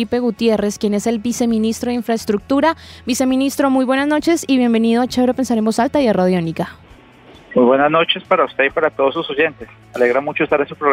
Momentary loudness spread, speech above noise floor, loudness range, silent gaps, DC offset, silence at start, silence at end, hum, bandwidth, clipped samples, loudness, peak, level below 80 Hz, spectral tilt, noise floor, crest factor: 5 LU; 27 dB; 2 LU; none; under 0.1%; 0 s; 0 s; none; 16 kHz; under 0.1%; -16 LUFS; -2 dBFS; -50 dBFS; -5 dB/octave; -43 dBFS; 14 dB